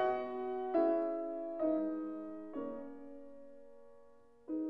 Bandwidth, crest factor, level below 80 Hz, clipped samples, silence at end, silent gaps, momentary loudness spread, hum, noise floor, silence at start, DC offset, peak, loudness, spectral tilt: 4.9 kHz; 18 dB; -76 dBFS; under 0.1%; 0 s; none; 22 LU; none; -63 dBFS; 0 s; 0.1%; -22 dBFS; -38 LUFS; -8 dB/octave